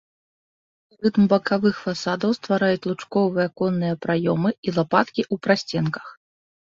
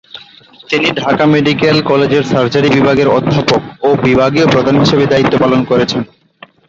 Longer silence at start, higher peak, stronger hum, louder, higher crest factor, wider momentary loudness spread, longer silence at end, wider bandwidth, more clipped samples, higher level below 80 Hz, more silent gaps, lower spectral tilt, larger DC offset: first, 1 s vs 0.15 s; about the same, -2 dBFS vs 0 dBFS; neither; second, -22 LUFS vs -11 LUFS; first, 20 dB vs 12 dB; about the same, 6 LU vs 4 LU; about the same, 0.6 s vs 0.65 s; about the same, 7.6 kHz vs 7.8 kHz; neither; second, -62 dBFS vs -42 dBFS; first, 4.58-4.63 s vs none; about the same, -6.5 dB/octave vs -6.5 dB/octave; neither